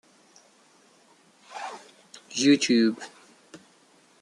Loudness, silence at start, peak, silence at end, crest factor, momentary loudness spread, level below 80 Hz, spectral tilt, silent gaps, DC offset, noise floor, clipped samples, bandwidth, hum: -23 LUFS; 1.5 s; -8 dBFS; 0.65 s; 20 dB; 25 LU; -78 dBFS; -3.5 dB/octave; none; under 0.1%; -60 dBFS; under 0.1%; 11.5 kHz; none